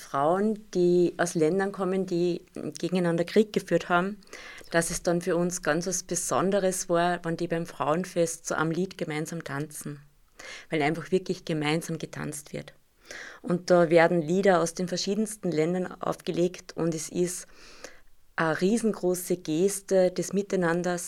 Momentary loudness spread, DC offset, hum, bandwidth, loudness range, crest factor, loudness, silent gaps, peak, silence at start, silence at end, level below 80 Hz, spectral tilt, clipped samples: 14 LU; under 0.1%; none; 16.5 kHz; 6 LU; 20 dB; -27 LUFS; none; -8 dBFS; 0 s; 0 s; -58 dBFS; -5 dB/octave; under 0.1%